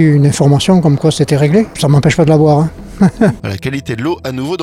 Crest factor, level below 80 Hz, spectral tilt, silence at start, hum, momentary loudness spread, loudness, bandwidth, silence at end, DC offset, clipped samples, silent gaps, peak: 10 dB; -36 dBFS; -6.5 dB/octave; 0 s; none; 10 LU; -12 LUFS; 13.5 kHz; 0 s; under 0.1%; under 0.1%; none; 0 dBFS